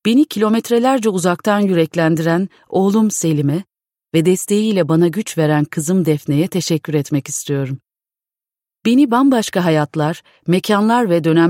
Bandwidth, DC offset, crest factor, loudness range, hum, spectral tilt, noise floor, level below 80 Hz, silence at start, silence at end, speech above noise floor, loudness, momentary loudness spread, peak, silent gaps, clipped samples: 16.5 kHz; under 0.1%; 14 dB; 3 LU; none; -6 dB/octave; -90 dBFS; -62 dBFS; 0.05 s; 0 s; 75 dB; -16 LUFS; 6 LU; -2 dBFS; none; under 0.1%